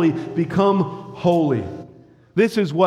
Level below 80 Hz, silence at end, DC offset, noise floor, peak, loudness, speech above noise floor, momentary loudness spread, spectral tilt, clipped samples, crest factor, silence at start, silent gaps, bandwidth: -58 dBFS; 0 s; under 0.1%; -47 dBFS; -4 dBFS; -20 LUFS; 29 dB; 9 LU; -7.5 dB/octave; under 0.1%; 16 dB; 0 s; none; 13 kHz